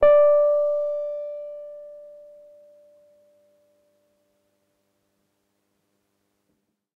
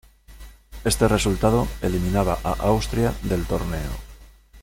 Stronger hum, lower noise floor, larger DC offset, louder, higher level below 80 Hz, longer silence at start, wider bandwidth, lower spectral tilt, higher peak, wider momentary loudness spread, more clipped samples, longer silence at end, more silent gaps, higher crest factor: neither; first, -74 dBFS vs -46 dBFS; neither; about the same, -21 LUFS vs -23 LUFS; second, -56 dBFS vs -32 dBFS; second, 0 s vs 0.3 s; second, 3.7 kHz vs 17 kHz; about the same, -6 dB/octave vs -5.5 dB/octave; second, -8 dBFS vs -4 dBFS; first, 26 LU vs 9 LU; neither; first, 4.9 s vs 0 s; neither; about the same, 18 dB vs 20 dB